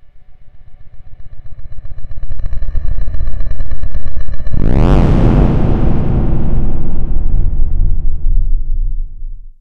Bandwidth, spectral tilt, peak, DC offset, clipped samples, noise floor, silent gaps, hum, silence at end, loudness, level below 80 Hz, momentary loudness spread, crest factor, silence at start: 3.3 kHz; -9.5 dB/octave; 0 dBFS; under 0.1%; under 0.1%; -31 dBFS; none; none; 0.1 s; -17 LUFS; -14 dBFS; 21 LU; 8 dB; 0.05 s